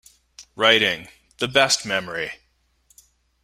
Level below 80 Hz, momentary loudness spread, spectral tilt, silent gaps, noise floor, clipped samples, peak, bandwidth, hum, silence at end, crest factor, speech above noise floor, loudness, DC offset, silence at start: -60 dBFS; 14 LU; -1.5 dB/octave; none; -65 dBFS; under 0.1%; 0 dBFS; 16 kHz; none; 1.1 s; 24 dB; 45 dB; -20 LUFS; under 0.1%; 0.4 s